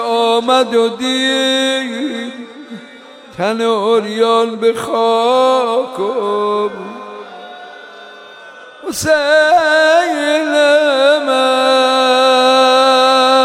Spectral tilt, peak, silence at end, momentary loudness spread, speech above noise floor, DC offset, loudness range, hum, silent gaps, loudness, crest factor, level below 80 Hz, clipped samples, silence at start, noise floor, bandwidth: -2.5 dB/octave; -2 dBFS; 0 s; 21 LU; 24 dB; under 0.1%; 7 LU; none; none; -12 LUFS; 12 dB; -58 dBFS; under 0.1%; 0 s; -37 dBFS; 16 kHz